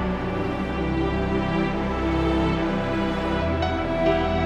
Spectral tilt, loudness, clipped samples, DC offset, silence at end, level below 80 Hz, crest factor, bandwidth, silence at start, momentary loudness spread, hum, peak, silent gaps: -7.5 dB/octave; -24 LUFS; under 0.1%; under 0.1%; 0 s; -32 dBFS; 16 dB; 9.4 kHz; 0 s; 4 LU; none; -8 dBFS; none